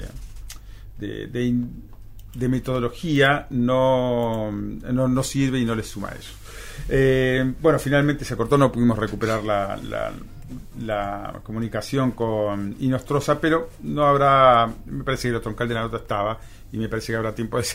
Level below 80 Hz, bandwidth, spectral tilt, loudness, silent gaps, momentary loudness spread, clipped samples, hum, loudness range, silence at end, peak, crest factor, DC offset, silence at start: -40 dBFS; 16 kHz; -6 dB/octave; -22 LUFS; none; 17 LU; under 0.1%; none; 6 LU; 0 s; -2 dBFS; 20 dB; under 0.1%; 0 s